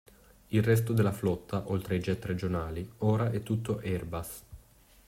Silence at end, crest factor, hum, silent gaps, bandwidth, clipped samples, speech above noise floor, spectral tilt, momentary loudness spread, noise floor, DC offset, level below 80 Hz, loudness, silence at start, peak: 0.5 s; 18 dB; none; none; 16 kHz; under 0.1%; 29 dB; -7 dB/octave; 11 LU; -59 dBFS; under 0.1%; -54 dBFS; -31 LUFS; 0.5 s; -14 dBFS